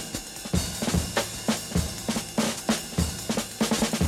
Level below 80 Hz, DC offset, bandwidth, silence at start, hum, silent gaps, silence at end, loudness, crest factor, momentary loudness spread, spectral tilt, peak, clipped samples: -40 dBFS; under 0.1%; 16.5 kHz; 0 s; none; none; 0 s; -28 LUFS; 16 dB; 4 LU; -4 dB/octave; -10 dBFS; under 0.1%